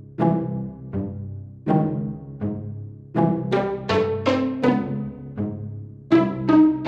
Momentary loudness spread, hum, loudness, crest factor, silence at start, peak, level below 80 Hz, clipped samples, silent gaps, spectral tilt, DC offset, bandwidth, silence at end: 14 LU; none; -23 LUFS; 18 dB; 0 s; -4 dBFS; -52 dBFS; under 0.1%; none; -8.5 dB/octave; under 0.1%; 7.6 kHz; 0 s